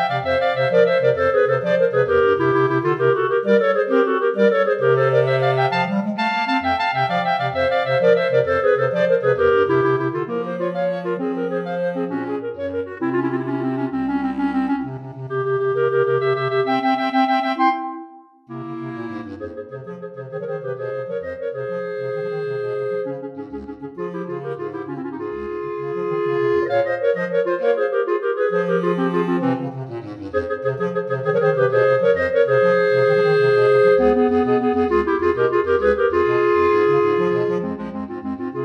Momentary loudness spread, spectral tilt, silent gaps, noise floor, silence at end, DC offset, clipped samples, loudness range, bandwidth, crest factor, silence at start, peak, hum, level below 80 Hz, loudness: 13 LU; -8 dB/octave; none; -42 dBFS; 0 s; under 0.1%; under 0.1%; 10 LU; 6.6 kHz; 16 dB; 0 s; -4 dBFS; none; -52 dBFS; -19 LUFS